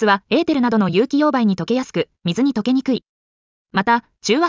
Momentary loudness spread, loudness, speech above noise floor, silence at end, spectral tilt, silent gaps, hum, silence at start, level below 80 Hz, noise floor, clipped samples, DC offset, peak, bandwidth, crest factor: 7 LU; -18 LUFS; over 73 dB; 0 s; -5.5 dB/octave; 3.09-3.65 s; none; 0 s; -58 dBFS; under -90 dBFS; under 0.1%; under 0.1%; -4 dBFS; 7.6 kHz; 14 dB